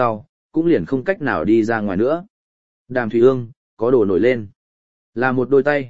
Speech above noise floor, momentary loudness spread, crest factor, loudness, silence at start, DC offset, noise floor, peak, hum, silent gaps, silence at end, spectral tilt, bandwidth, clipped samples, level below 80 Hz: over 73 dB; 10 LU; 16 dB; -18 LUFS; 0 s; 1%; under -90 dBFS; -2 dBFS; none; 0.29-0.49 s, 2.30-2.85 s, 3.57-3.77 s, 4.56-5.13 s; 0 s; -8.5 dB/octave; 7.8 kHz; under 0.1%; -52 dBFS